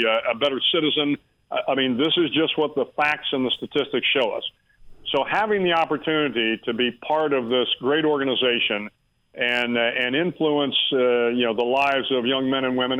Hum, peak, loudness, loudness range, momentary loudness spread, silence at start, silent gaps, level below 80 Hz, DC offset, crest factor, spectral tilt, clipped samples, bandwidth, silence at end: none; -8 dBFS; -22 LUFS; 2 LU; 5 LU; 0 s; none; -60 dBFS; under 0.1%; 14 dB; -6 dB/octave; under 0.1%; 10 kHz; 0 s